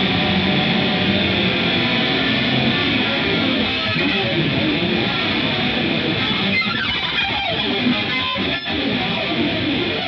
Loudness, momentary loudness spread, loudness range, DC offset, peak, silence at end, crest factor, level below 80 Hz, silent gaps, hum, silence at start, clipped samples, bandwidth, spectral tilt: -18 LUFS; 3 LU; 2 LU; under 0.1%; -4 dBFS; 0 s; 14 dB; -44 dBFS; none; none; 0 s; under 0.1%; 7 kHz; -6.5 dB/octave